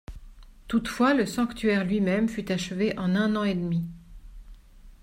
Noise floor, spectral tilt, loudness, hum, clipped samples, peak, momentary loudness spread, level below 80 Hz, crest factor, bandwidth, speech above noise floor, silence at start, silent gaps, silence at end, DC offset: -49 dBFS; -6 dB/octave; -26 LUFS; none; under 0.1%; -10 dBFS; 7 LU; -48 dBFS; 16 dB; 16 kHz; 24 dB; 0.1 s; none; 0.1 s; under 0.1%